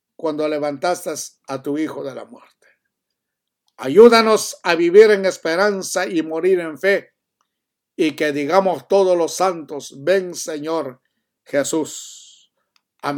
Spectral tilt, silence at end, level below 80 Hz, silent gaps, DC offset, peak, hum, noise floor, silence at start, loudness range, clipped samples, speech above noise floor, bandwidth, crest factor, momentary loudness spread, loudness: -4 dB/octave; 0 s; -70 dBFS; none; under 0.1%; 0 dBFS; none; -80 dBFS; 0.25 s; 10 LU; under 0.1%; 63 dB; 18 kHz; 18 dB; 18 LU; -17 LUFS